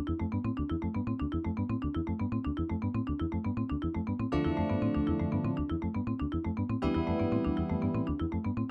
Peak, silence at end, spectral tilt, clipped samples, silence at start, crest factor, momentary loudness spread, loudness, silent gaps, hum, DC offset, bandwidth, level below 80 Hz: -16 dBFS; 0 s; -10 dB/octave; under 0.1%; 0 s; 14 dB; 4 LU; -33 LUFS; none; none; under 0.1%; 6 kHz; -42 dBFS